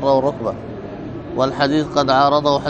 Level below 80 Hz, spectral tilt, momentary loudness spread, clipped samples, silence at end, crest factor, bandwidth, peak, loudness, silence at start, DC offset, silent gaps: -44 dBFS; -6 dB/octave; 16 LU; under 0.1%; 0 s; 16 dB; 8.6 kHz; 0 dBFS; -17 LUFS; 0 s; under 0.1%; none